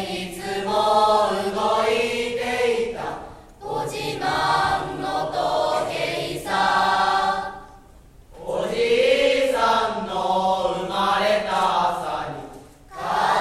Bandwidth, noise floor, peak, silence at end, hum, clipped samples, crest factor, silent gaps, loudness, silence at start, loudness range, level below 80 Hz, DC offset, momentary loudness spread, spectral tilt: 15 kHz; -48 dBFS; -6 dBFS; 0 s; none; under 0.1%; 16 dB; none; -22 LUFS; 0 s; 4 LU; -48 dBFS; under 0.1%; 12 LU; -3.5 dB/octave